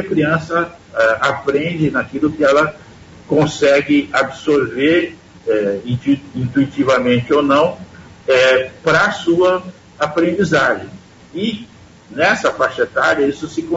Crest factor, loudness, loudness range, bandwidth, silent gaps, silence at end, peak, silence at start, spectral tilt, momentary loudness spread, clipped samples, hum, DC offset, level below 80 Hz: 14 dB; -16 LUFS; 3 LU; 8 kHz; none; 0 s; -2 dBFS; 0 s; -5.5 dB/octave; 9 LU; under 0.1%; none; under 0.1%; -50 dBFS